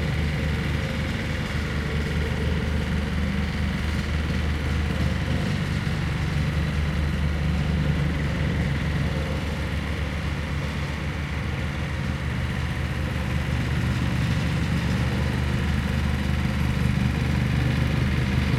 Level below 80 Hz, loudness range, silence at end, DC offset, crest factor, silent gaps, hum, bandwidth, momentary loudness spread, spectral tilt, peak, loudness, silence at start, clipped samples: -32 dBFS; 3 LU; 0 s; under 0.1%; 14 dB; none; none; 14 kHz; 4 LU; -6.5 dB/octave; -10 dBFS; -26 LUFS; 0 s; under 0.1%